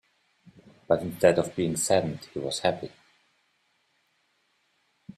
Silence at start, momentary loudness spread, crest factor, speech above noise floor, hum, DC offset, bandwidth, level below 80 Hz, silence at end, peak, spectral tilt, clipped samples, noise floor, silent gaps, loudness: 0.9 s; 12 LU; 24 dB; 45 dB; none; under 0.1%; 14.5 kHz; -64 dBFS; 2.3 s; -6 dBFS; -4.5 dB/octave; under 0.1%; -71 dBFS; none; -26 LUFS